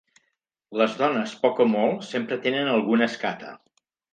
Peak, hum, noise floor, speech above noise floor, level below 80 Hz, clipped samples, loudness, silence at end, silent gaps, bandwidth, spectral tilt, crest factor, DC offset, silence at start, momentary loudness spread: -4 dBFS; none; -76 dBFS; 53 dB; -76 dBFS; under 0.1%; -24 LUFS; 0.55 s; none; 9.2 kHz; -5.5 dB/octave; 20 dB; under 0.1%; 0.7 s; 9 LU